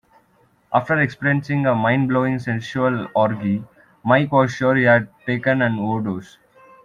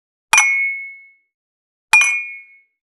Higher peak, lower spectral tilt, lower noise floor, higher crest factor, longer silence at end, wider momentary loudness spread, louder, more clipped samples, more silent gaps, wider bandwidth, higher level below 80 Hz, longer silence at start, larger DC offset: about the same, -2 dBFS vs 0 dBFS; first, -7.5 dB/octave vs 3.5 dB/octave; first, -59 dBFS vs -40 dBFS; about the same, 18 dB vs 20 dB; about the same, 0.6 s vs 0.6 s; second, 8 LU vs 17 LU; second, -19 LUFS vs -13 LUFS; neither; second, none vs 1.34-1.88 s; second, 9.4 kHz vs 14 kHz; first, -58 dBFS vs -64 dBFS; first, 0.7 s vs 0.35 s; neither